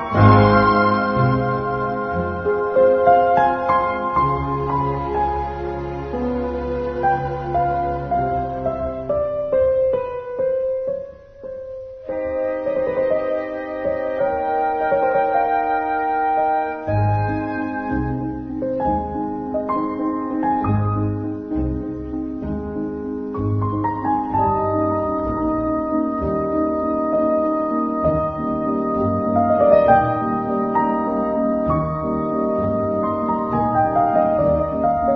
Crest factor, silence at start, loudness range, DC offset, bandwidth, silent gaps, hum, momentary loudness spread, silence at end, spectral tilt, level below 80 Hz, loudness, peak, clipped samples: 20 dB; 0 s; 5 LU; under 0.1%; 6 kHz; none; none; 10 LU; 0 s; -10 dB/octave; -38 dBFS; -20 LUFS; 0 dBFS; under 0.1%